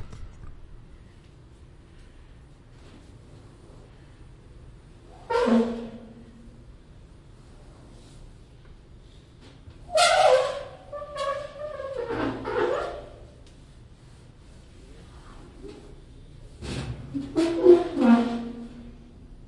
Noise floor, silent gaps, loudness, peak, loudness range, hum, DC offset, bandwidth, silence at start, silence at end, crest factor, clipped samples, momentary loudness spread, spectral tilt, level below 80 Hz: -50 dBFS; none; -24 LUFS; -4 dBFS; 19 LU; none; under 0.1%; 11.5 kHz; 0 s; 0 s; 24 dB; under 0.1%; 29 LU; -4.5 dB/octave; -48 dBFS